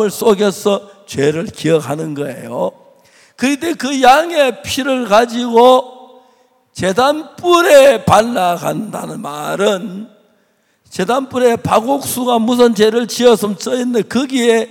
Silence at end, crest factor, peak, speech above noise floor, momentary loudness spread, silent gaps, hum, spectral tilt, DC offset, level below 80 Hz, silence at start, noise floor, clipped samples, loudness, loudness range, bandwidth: 0.05 s; 14 dB; 0 dBFS; 45 dB; 13 LU; none; none; -4.5 dB/octave; under 0.1%; -54 dBFS; 0 s; -58 dBFS; under 0.1%; -13 LUFS; 7 LU; 17 kHz